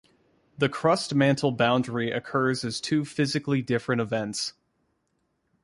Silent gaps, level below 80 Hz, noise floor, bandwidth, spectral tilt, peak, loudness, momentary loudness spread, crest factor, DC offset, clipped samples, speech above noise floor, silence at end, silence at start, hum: none; -64 dBFS; -74 dBFS; 11.5 kHz; -5.5 dB/octave; -8 dBFS; -26 LUFS; 6 LU; 18 dB; under 0.1%; under 0.1%; 49 dB; 1.15 s; 0.6 s; none